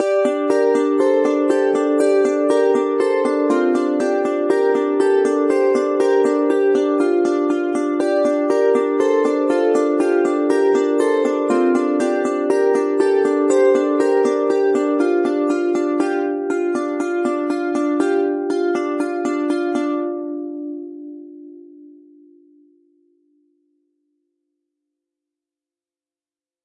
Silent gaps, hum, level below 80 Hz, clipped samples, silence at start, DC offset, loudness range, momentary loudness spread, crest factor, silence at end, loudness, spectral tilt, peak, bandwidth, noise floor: none; none; -80 dBFS; under 0.1%; 0 s; under 0.1%; 6 LU; 5 LU; 14 dB; 4.8 s; -18 LUFS; -4.5 dB/octave; -4 dBFS; 11 kHz; under -90 dBFS